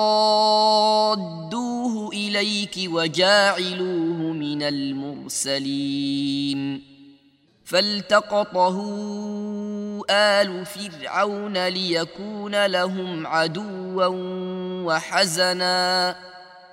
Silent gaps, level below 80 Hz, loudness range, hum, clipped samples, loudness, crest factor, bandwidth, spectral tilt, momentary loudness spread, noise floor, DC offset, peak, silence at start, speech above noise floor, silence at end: none; -70 dBFS; 4 LU; none; under 0.1%; -22 LUFS; 20 dB; 16 kHz; -3.5 dB/octave; 12 LU; -59 dBFS; under 0.1%; -4 dBFS; 0 s; 36 dB; 0.05 s